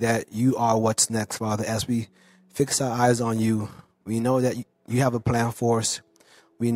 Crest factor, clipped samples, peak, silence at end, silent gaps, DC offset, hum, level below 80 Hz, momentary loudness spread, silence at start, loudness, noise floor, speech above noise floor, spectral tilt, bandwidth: 18 dB; under 0.1%; -6 dBFS; 0 s; none; under 0.1%; none; -54 dBFS; 9 LU; 0 s; -24 LUFS; -57 dBFS; 33 dB; -5 dB/octave; 16 kHz